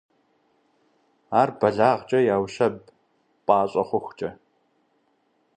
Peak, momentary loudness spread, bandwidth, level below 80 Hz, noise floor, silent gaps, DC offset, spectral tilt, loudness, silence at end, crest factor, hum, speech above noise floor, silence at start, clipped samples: -4 dBFS; 13 LU; 9.4 kHz; -64 dBFS; -68 dBFS; none; under 0.1%; -6.5 dB/octave; -23 LUFS; 1.25 s; 22 dB; none; 46 dB; 1.3 s; under 0.1%